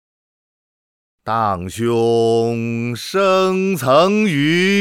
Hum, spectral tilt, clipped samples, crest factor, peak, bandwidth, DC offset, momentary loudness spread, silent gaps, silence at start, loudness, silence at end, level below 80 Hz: none; -5.5 dB/octave; under 0.1%; 16 dB; -2 dBFS; 18 kHz; under 0.1%; 8 LU; none; 1.25 s; -16 LUFS; 0 s; -60 dBFS